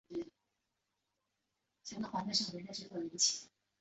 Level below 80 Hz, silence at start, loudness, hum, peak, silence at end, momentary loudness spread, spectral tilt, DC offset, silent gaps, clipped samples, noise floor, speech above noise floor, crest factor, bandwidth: -78 dBFS; 0.1 s; -37 LUFS; none; -18 dBFS; 0.35 s; 16 LU; -2 dB/octave; under 0.1%; none; under 0.1%; -86 dBFS; 48 dB; 24 dB; 8.2 kHz